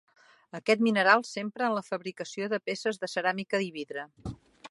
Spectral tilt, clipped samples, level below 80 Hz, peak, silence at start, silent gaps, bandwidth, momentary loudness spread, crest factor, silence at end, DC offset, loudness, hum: -4.5 dB/octave; under 0.1%; -62 dBFS; -6 dBFS; 0.55 s; none; 11.5 kHz; 18 LU; 24 dB; 0.05 s; under 0.1%; -29 LUFS; none